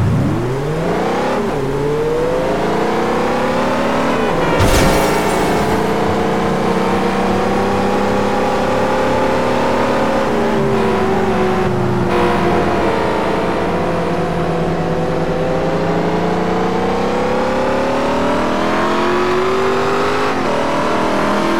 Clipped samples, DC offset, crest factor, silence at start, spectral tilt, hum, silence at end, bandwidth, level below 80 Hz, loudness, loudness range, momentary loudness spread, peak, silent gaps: under 0.1%; 5%; 12 dB; 0 s; -6 dB/octave; none; 0 s; 18.5 kHz; -32 dBFS; -16 LUFS; 2 LU; 3 LU; -2 dBFS; none